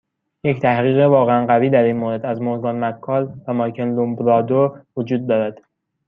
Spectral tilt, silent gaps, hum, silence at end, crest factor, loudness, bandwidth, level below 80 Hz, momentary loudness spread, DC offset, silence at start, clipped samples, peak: -10 dB/octave; none; none; 0.55 s; 16 dB; -18 LUFS; 5.2 kHz; -62 dBFS; 9 LU; under 0.1%; 0.45 s; under 0.1%; -2 dBFS